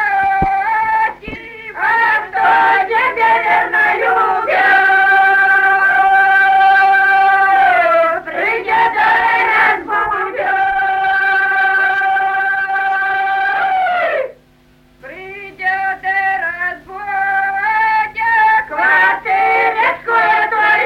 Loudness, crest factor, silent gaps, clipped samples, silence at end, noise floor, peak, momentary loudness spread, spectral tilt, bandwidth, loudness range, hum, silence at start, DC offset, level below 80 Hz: -12 LUFS; 12 dB; none; under 0.1%; 0 s; -49 dBFS; -2 dBFS; 8 LU; -4 dB/octave; 13.5 kHz; 8 LU; none; 0 s; under 0.1%; -46 dBFS